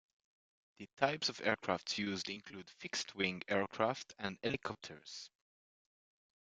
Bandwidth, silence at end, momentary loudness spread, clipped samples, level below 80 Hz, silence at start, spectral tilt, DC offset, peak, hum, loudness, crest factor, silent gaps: 9.4 kHz; 1.15 s; 15 LU; under 0.1%; -76 dBFS; 0.8 s; -3.5 dB/octave; under 0.1%; -14 dBFS; none; -38 LUFS; 28 dB; 0.93-0.97 s